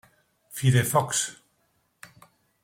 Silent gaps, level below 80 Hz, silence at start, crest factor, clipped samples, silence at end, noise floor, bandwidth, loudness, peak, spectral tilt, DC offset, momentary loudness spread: none; -60 dBFS; 0.5 s; 20 dB; under 0.1%; 1.3 s; -70 dBFS; 16.5 kHz; -24 LUFS; -8 dBFS; -4.5 dB/octave; under 0.1%; 11 LU